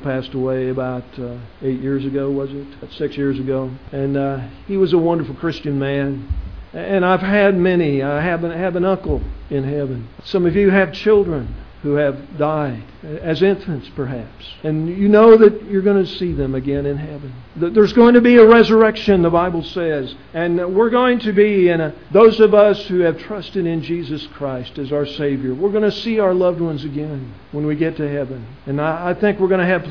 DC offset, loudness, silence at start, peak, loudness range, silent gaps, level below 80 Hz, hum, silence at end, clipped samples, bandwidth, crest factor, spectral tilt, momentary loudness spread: 0.5%; -16 LUFS; 0 s; 0 dBFS; 9 LU; none; -38 dBFS; none; 0 s; under 0.1%; 5.4 kHz; 16 dB; -8.5 dB/octave; 16 LU